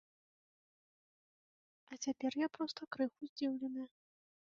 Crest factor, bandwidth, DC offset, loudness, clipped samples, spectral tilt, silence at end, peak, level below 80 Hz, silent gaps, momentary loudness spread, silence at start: 20 dB; 7.4 kHz; under 0.1%; -41 LUFS; under 0.1%; -2.5 dB/octave; 0.55 s; -24 dBFS; -86 dBFS; 3.29-3.36 s; 8 LU; 1.9 s